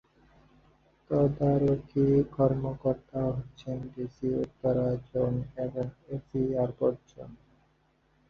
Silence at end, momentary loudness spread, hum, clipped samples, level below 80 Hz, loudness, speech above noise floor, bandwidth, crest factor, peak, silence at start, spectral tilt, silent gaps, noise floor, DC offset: 0.95 s; 13 LU; none; under 0.1%; -54 dBFS; -30 LUFS; 39 dB; 6.6 kHz; 18 dB; -12 dBFS; 1.1 s; -11 dB/octave; none; -68 dBFS; under 0.1%